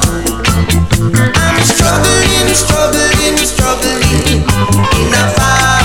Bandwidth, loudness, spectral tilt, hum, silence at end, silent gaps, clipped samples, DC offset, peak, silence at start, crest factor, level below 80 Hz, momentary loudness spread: 18.5 kHz; -10 LUFS; -3.5 dB/octave; none; 0 s; none; under 0.1%; under 0.1%; 0 dBFS; 0 s; 10 dB; -20 dBFS; 3 LU